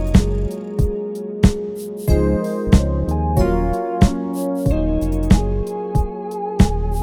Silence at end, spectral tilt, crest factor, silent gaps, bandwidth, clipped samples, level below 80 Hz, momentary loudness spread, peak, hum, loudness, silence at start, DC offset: 0 s; -7.5 dB/octave; 18 dB; none; 16 kHz; under 0.1%; -22 dBFS; 8 LU; 0 dBFS; none; -19 LUFS; 0 s; under 0.1%